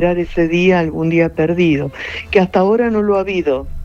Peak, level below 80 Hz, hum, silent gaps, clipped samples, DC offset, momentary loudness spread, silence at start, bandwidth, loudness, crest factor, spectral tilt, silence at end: 0 dBFS; -34 dBFS; none; none; under 0.1%; under 0.1%; 6 LU; 0 s; 7.4 kHz; -15 LUFS; 14 dB; -7.5 dB/octave; 0 s